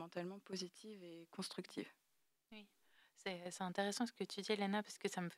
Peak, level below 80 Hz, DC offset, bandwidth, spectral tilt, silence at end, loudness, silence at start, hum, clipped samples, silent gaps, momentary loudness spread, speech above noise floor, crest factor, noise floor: -24 dBFS; under -90 dBFS; under 0.1%; 15.5 kHz; -4 dB/octave; 0 s; -45 LUFS; 0 s; none; under 0.1%; none; 16 LU; 33 dB; 22 dB; -79 dBFS